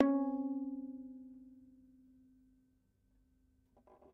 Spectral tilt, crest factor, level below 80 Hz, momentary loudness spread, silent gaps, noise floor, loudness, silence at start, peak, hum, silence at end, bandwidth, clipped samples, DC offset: -6.5 dB/octave; 28 dB; -76 dBFS; 24 LU; none; -75 dBFS; -39 LUFS; 0 s; -14 dBFS; none; 2.5 s; 2.6 kHz; under 0.1%; under 0.1%